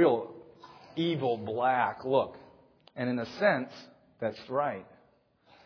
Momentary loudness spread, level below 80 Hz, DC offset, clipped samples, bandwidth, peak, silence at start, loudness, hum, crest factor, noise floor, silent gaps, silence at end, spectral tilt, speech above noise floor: 16 LU; -74 dBFS; under 0.1%; under 0.1%; 5.4 kHz; -12 dBFS; 0 s; -31 LUFS; none; 20 dB; -66 dBFS; none; 0.8 s; -7.5 dB/octave; 37 dB